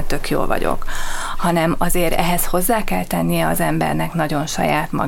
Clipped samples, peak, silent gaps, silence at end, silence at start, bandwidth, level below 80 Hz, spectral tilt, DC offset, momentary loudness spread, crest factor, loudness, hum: under 0.1%; -2 dBFS; none; 0 s; 0 s; 17 kHz; -26 dBFS; -4.5 dB/octave; under 0.1%; 5 LU; 14 dB; -19 LUFS; none